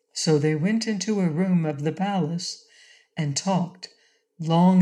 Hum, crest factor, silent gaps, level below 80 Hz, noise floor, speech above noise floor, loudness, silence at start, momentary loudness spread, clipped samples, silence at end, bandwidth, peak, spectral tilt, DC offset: none; 16 dB; none; -74 dBFS; -55 dBFS; 32 dB; -24 LUFS; 0.15 s; 13 LU; under 0.1%; 0 s; 11 kHz; -8 dBFS; -6 dB/octave; under 0.1%